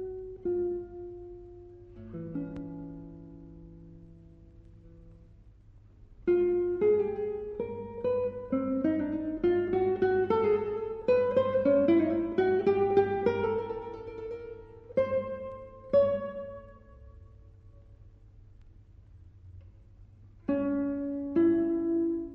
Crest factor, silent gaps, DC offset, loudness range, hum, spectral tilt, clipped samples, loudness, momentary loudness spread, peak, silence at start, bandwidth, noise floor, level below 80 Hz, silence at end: 18 dB; none; under 0.1%; 17 LU; none; -9.5 dB/octave; under 0.1%; -29 LUFS; 20 LU; -12 dBFS; 0 s; 5.6 kHz; -55 dBFS; -56 dBFS; 0 s